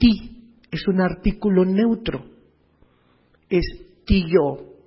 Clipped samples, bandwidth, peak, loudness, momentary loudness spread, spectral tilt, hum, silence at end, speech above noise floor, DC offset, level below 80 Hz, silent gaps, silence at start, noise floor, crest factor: under 0.1%; 5.8 kHz; -4 dBFS; -21 LUFS; 14 LU; -11.5 dB/octave; none; 0.2 s; 40 dB; under 0.1%; -34 dBFS; none; 0 s; -59 dBFS; 18 dB